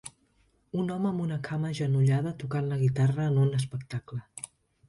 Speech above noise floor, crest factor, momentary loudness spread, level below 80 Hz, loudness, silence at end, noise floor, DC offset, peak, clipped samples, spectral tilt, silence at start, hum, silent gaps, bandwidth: 40 dB; 14 dB; 15 LU; -62 dBFS; -29 LUFS; 0.45 s; -68 dBFS; under 0.1%; -14 dBFS; under 0.1%; -7.5 dB/octave; 0.05 s; none; none; 11.5 kHz